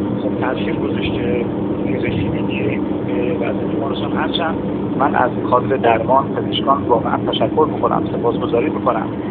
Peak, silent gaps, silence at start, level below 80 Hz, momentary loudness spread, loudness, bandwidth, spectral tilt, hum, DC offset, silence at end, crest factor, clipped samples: 0 dBFS; none; 0 s; -42 dBFS; 5 LU; -18 LUFS; 4.4 kHz; -5 dB/octave; none; under 0.1%; 0 s; 18 dB; under 0.1%